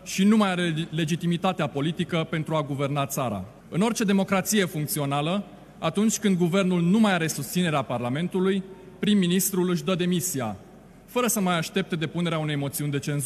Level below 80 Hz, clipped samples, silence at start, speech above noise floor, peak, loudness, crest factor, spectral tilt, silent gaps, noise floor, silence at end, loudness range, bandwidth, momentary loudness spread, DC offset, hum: -60 dBFS; under 0.1%; 0 s; 24 dB; -8 dBFS; -25 LUFS; 16 dB; -5 dB/octave; none; -48 dBFS; 0 s; 3 LU; 14.5 kHz; 8 LU; under 0.1%; none